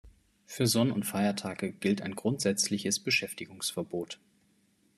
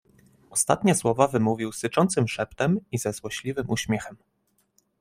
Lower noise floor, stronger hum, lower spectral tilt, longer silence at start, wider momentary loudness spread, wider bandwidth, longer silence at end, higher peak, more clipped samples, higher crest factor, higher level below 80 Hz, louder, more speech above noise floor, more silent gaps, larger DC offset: about the same, -69 dBFS vs -68 dBFS; neither; about the same, -4 dB/octave vs -5 dB/octave; second, 0.05 s vs 0.5 s; about the same, 11 LU vs 9 LU; second, 13.5 kHz vs 16 kHz; about the same, 0.8 s vs 0.85 s; second, -14 dBFS vs -4 dBFS; neither; about the same, 18 dB vs 22 dB; second, -68 dBFS vs -58 dBFS; second, -30 LUFS vs -25 LUFS; second, 38 dB vs 43 dB; neither; neither